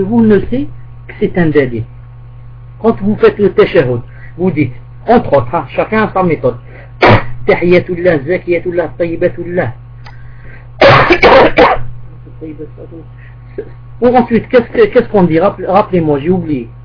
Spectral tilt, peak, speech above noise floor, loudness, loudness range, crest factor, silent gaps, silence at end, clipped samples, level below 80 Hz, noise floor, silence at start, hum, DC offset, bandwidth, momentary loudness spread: -8 dB/octave; 0 dBFS; 20 dB; -11 LUFS; 4 LU; 12 dB; none; 0 s; 0.9%; -30 dBFS; -31 dBFS; 0 s; none; under 0.1%; 5.4 kHz; 21 LU